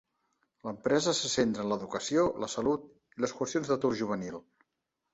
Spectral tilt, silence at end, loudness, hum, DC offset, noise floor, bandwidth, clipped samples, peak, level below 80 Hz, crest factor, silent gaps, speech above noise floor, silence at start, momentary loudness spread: -4 dB/octave; 0.75 s; -31 LUFS; none; under 0.1%; -84 dBFS; 8.2 kHz; under 0.1%; -14 dBFS; -64 dBFS; 18 dB; none; 54 dB; 0.65 s; 14 LU